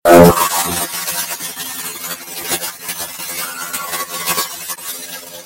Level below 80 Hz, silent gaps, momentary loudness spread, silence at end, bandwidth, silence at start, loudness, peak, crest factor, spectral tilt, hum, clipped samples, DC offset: -42 dBFS; none; 12 LU; 0 s; 17 kHz; 0.05 s; -17 LUFS; 0 dBFS; 16 dB; -3.5 dB/octave; none; 0.3%; under 0.1%